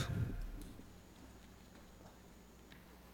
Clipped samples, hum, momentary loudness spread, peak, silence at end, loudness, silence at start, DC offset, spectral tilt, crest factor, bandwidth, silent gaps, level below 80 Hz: under 0.1%; none; 17 LU; -26 dBFS; 0 s; -51 LUFS; 0 s; under 0.1%; -6 dB/octave; 22 dB; 17.5 kHz; none; -54 dBFS